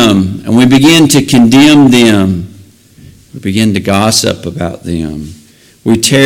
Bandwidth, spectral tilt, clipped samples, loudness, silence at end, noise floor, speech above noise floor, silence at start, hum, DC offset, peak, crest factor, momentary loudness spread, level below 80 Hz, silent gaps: 17 kHz; -4.5 dB/octave; 0.3%; -8 LUFS; 0 s; -37 dBFS; 30 dB; 0 s; none; under 0.1%; 0 dBFS; 8 dB; 15 LU; -38 dBFS; none